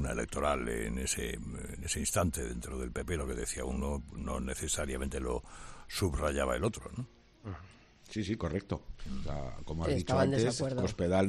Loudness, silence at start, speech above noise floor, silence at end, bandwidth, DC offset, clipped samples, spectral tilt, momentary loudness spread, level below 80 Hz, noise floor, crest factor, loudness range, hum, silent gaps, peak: -35 LUFS; 0 s; 22 dB; 0 s; 14 kHz; under 0.1%; under 0.1%; -5 dB/octave; 13 LU; -44 dBFS; -56 dBFS; 20 dB; 4 LU; none; none; -16 dBFS